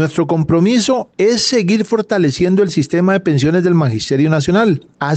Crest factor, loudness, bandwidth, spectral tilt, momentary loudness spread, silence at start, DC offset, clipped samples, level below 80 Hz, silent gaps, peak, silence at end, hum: 10 dB; -14 LUFS; 9 kHz; -6 dB/octave; 3 LU; 0 s; under 0.1%; under 0.1%; -46 dBFS; none; -4 dBFS; 0 s; none